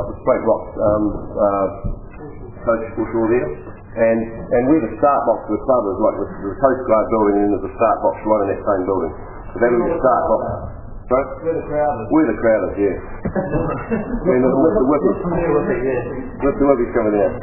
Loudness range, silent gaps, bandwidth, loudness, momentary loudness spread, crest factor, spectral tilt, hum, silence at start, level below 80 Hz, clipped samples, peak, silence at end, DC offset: 3 LU; none; 2.9 kHz; -18 LUFS; 11 LU; 18 dB; -13.5 dB/octave; none; 0 s; -36 dBFS; under 0.1%; 0 dBFS; 0 s; under 0.1%